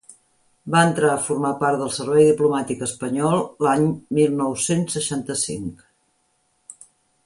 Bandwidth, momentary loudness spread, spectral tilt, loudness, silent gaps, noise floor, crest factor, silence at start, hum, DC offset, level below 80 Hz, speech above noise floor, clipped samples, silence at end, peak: 11.5 kHz; 9 LU; -5 dB/octave; -20 LUFS; none; -67 dBFS; 20 dB; 0.1 s; none; under 0.1%; -58 dBFS; 47 dB; under 0.1%; 0.55 s; -2 dBFS